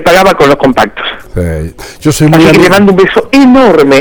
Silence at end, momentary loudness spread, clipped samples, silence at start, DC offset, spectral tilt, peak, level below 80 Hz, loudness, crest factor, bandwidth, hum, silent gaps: 0 s; 13 LU; 2%; 0 s; under 0.1%; -5.5 dB/octave; 0 dBFS; -28 dBFS; -6 LUFS; 6 dB; over 20 kHz; none; none